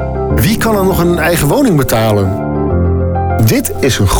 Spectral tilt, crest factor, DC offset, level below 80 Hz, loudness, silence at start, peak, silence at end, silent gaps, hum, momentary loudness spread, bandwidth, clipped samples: -5.5 dB/octave; 8 dB; under 0.1%; -24 dBFS; -12 LUFS; 0 s; -2 dBFS; 0 s; none; none; 4 LU; over 20 kHz; under 0.1%